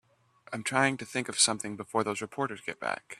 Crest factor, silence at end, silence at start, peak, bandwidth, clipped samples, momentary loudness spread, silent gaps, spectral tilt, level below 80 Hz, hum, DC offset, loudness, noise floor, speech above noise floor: 24 dB; 0.05 s; 0.5 s; -8 dBFS; 13.5 kHz; under 0.1%; 11 LU; none; -2.5 dB/octave; -72 dBFS; none; under 0.1%; -30 LUFS; -60 dBFS; 29 dB